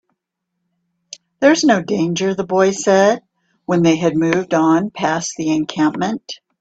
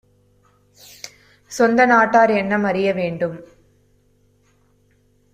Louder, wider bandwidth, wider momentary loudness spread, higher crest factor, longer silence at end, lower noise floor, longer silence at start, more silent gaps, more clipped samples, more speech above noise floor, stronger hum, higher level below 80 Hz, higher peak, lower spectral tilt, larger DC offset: about the same, -16 LUFS vs -17 LUFS; second, 8 kHz vs 15.5 kHz; second, 9 LU vs 24 LU; about the same, 16 dB vs 18 dB; second, 0.25 s vs 1.9 s; first, -76 dBFS vs -59 dBFS; first, 1.4 s vs 1.05 s; neither; neither; first, 61 dB vs 42 dB; second, none vs 50 Hz at -55 dBFS; about the same, -58 dBFS vs -60 dBFS; about the same, 0 dBFS vs -2 dBFS; about the same, -5 dB/octave vs -5.5 dB/octave; neither